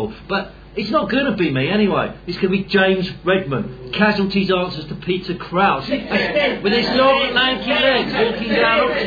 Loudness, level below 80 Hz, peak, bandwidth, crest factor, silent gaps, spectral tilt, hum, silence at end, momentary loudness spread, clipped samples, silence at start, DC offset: -18 LUFS; -44 dBFS; 0 dBFS; 5 kHz; 18 dB; none; -7 dB/octave; none; 0 s; 9 LU; under 0.1%; 0 s; under 0.1%